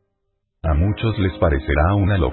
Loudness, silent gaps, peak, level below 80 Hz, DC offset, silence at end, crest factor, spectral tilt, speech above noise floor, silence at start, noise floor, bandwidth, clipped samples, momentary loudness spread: -19 LUFS; none; -4 dBFS; -24 dBFS; under 0.1%; 0 s; 14 dB; -12.5 dB/octave; 55 dB; 0.65 s; -72 dBFS; 4.3 kHz; under 0.1%; 4 LU